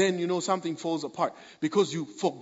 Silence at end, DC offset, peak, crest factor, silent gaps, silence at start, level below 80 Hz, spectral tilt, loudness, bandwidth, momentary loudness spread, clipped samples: 0 s; under 0.1%; -10 dBFS; 18 dB; none; 0 s; -80 dBFS; -5 dB/octave; -29 LUFS; 8 kHz; 5 LU; under 0.1%